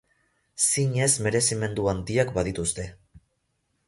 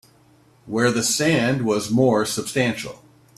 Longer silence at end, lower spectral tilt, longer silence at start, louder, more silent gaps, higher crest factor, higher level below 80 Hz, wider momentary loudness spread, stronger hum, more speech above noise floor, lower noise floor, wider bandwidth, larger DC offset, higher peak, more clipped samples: first, 0.7 s vs 0.4 s; about the same, -4 dB/octave vs -4.5 dB/octave; about the same, 0.55 s vs 0.65 s; second, -24 LUFS vs -20 LUFS; neither; about the same, 20 dB vs 16 dB; first, -48 dBFS vs -58 dBFS; about the same, 10 LU vs 8 LU; neither; first, 49 dB vs 34 dB; first, -74 dBFS vs -55 dBFS; second, 12 kHz vs 15 kHz; neither; about the same, -6 dBFS vs -6 dBFS; neither